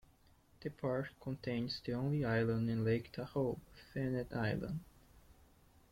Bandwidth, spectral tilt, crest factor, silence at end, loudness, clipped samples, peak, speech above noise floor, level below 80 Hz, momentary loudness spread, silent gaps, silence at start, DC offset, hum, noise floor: 16.5 kHz; -8 dB/octave; 16 dB; 0.6 s; -39 LUFS; under 0.1%; -24 dBFS; 30 dB; -62 dBFS; 12 LU; none; 0.6 s; under 0.1%; none; -68 dBFS